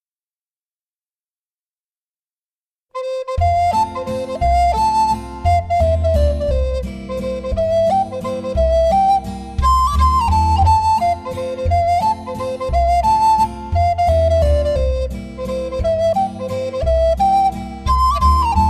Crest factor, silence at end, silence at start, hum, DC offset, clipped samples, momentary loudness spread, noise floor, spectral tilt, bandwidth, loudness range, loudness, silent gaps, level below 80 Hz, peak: 14 dB; 0 s; 2.95 s; none; under 0.1%; under 0.1%; 10 LU; under -90 dBFS; -6.5 dB/octave; 13.5 kHz; 5 LU; -17 LUFS; none; -24 dBFS; -2 dBFS